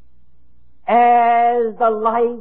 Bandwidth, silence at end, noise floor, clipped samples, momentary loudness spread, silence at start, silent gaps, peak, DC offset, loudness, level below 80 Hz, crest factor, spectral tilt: 3.9 kHz; 0 s; -58 dBFS; under 0.1%; 6 LU; 0.85 s; none; -2 dBFS; 1%; -15 LUFS; -60 dBFS; 14 dB; -10 dB/octave